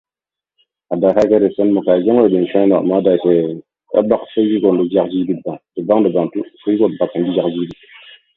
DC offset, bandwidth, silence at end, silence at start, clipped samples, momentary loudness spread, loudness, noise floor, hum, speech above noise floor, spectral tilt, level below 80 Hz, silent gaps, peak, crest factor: under 0.1%; 7.2 kHz; 0.65 s; 0.9 s; under 0.1%; 11 LU; -15 LUFS; -88 dBFS; none; 74 dB; -9 dB/octave; -56 dBFS; none; 0 dBFS; 16 dB